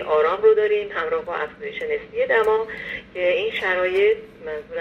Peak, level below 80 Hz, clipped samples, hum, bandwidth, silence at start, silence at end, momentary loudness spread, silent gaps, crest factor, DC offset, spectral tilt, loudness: -6 dBFS; -56 dBFS; under 0.1%; none; 6.4 kHz; 0 s; 0 s; 13 LU; none; 14 dB; under 0.1%; -5 dB/octave; -21 LUFS